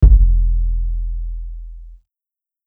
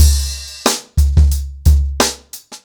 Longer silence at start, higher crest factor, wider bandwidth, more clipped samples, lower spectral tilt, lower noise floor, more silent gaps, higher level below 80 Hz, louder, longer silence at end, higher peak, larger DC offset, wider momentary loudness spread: about the same, 0 s vs 0 s; about the same, 16 dB vs 12 dB; second, 0.9 kHz vs 20 kHz; neither; first, -12.5 dB/octave vs -4 dB/octave; first, -89 dBFS vs -36 dBFS; neither; about the same, -16 dBFS vs -16 dBFS; second, -19 LUFS vs -16 LUFS; first, 0.7 s vs 0.1 s; about the same, 0 dBFS vs -2 dBFS; neither; first, 21 LU vs 9 LU